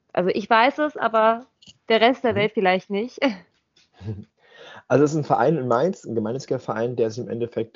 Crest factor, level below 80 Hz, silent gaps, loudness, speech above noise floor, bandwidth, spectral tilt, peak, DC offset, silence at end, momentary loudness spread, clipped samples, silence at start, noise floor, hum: 20 dB; -66 dBFS; none; -22 LUFS; 40 dB; 7.4 kHz; -4 dB/octave; -2 dBFS; under 0.1%; 0.1 s; 11 LU; under 0.1%; 0.15 s; -61 dBFS; none